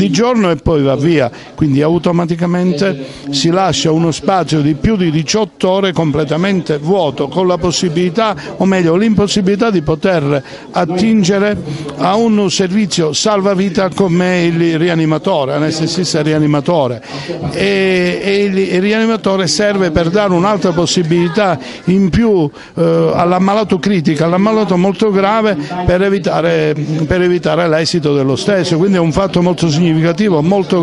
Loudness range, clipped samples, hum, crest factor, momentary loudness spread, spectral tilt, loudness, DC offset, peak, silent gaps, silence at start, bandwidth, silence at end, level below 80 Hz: 1 LU; under 0.1%; none; 12 dB; 4 LU; -5.5 dB/octave; -13 LUFS; under 0.1%; 0 dBFS; none; 0 s; 11.5 kHz; 0 s; -38 dBFS